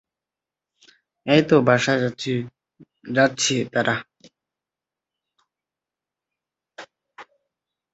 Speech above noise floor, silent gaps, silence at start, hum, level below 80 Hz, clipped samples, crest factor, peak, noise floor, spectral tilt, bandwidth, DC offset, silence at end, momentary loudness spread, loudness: 69 dB; none; 1.25 s; none; -64 dBFS; under 0.1%; 22 dB; -2 dBFS; -88 dBFS; -4.5 dB/octave; 8.2 kHz; under 0.1%; 0.7 s; 12 LU; -20 LUFS